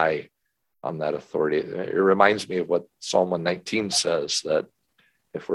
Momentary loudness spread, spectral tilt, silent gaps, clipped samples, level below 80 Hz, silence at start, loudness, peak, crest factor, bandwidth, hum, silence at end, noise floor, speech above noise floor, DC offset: 13 LU; -3.5 dB/octave; none; under 0.1%; -64 dBFS; 0 s; -24 LUFS; -2 dBFS; 22 dB; 12.5 kHz; none; 0 s; -77 dBFS; 54 dB; under 0.1%